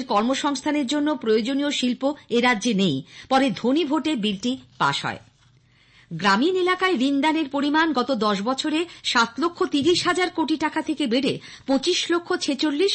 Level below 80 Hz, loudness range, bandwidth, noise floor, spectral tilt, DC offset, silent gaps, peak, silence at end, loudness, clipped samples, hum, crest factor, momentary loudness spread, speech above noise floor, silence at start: -62 dBFS; 2 LU; 8.8 kHz; -57 dBFS; -4 dB/octave; under 0.1%; none; -8 dBFS; 0 s; -22 LUFS; under 0.1%; none; 14 dB; 5 LU; 35 dB; 0 s